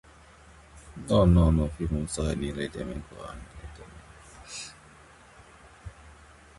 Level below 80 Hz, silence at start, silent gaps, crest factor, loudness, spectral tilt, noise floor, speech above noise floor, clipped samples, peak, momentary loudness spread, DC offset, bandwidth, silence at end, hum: -36 dBFS; 0.75 s; none; 20 dB; -27 LUFS; -7 dB/octave; -53 dBFS; 27 dB; under 0.1%; -8 dBFS; 27 LU; under 0.1%; 11.5 kHz; 0.45 s; none